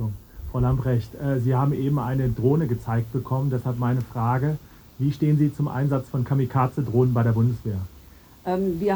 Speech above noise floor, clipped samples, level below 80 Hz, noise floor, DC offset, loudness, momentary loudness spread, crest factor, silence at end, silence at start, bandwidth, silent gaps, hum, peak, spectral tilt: 26 dB; under 0.1%; -44 dBFS; -48 dBFS; under 0.1%; -24 LUFS; 8 LU; 16 dB; 0 s; 0 s; over 20 kHz; none; none; -8 dBFS; -9.5 dB/octave